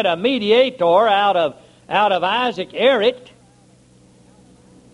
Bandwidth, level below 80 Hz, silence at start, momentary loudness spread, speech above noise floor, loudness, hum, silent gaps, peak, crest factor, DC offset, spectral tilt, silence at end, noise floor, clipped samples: 11 kHz; -62 dBFS; 0 s; 8 LU; 34 dB; -17 LUFS; none; none; -2 dBFS; 16 dB; under 0.1%; -5 dB/octave; 1.75 s; -51 dBFS; under 0.1%